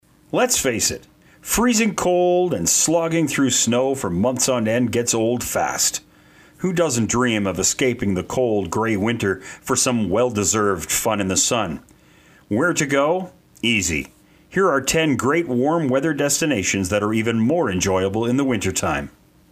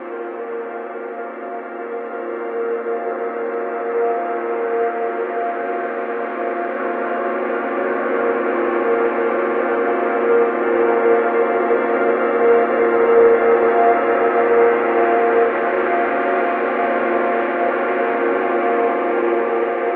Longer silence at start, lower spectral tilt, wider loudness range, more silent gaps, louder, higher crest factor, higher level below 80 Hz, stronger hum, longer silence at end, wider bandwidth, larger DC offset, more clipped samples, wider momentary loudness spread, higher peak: first, 0.35 s vs 0 s; second, -3.5 dB/octave vs -8 dB/octave; second, 2 LU vs 8 LU; neither; about the same, -19 LUFS vs -18 LUFS; about the same, 16 dB vs 16 dB; first, -48 dBFS vs -62 dBFS; neither; first, 0.4 s vs 0 s; first, 16 kHz vs 4 kHz; neither; neither; second, 7 LU vs 12 LU; about the same, -4 dBFS vs -2 dBFS